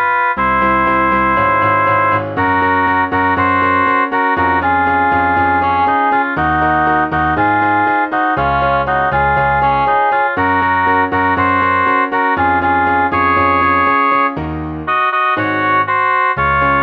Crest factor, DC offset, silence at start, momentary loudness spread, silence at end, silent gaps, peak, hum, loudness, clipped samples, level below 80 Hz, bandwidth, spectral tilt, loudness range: 12 dB; under 0.1%; 0 s; 2 LU; 0 s; none; 0 dBFS; none; -13 LUFS; under 0.1%; -36 dBFS; 5.4 kHz; -8 dB/octave; 1 LU